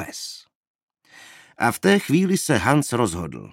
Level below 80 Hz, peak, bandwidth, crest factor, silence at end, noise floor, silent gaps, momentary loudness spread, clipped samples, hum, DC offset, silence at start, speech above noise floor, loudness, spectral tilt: -52 dBFS; -2 dBFS; 17 kHz; 22 dB; 0.05 s; -48 dBFS; 0.55-0.88 s; 15 LU; under 0.1%; none; under 0.1%; 0 s; 28 dB; -21 LUFS; -5 dB/octave